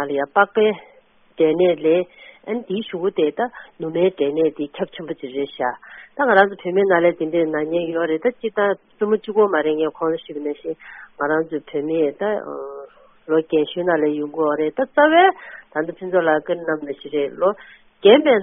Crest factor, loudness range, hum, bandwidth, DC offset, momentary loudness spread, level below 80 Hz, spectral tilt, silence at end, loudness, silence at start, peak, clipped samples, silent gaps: 20 dB; 4 LU; none; 3.9 kHz; under 0.1%; 13 LU; -64 dBFS; -1 dB/octave; 0 s; -20 LUFS; 0 s; 0 dBFS; under 0.1%; none